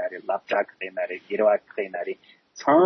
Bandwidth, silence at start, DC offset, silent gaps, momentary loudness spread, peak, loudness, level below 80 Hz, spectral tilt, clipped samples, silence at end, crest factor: 6.4 kHz; 0 s; under 0.1%; none; 12 LU; -6 dBFS; -26 LUFS; -80 dBFS; -5.5 dB/octave; under 0.1%; 0 s; 18 dB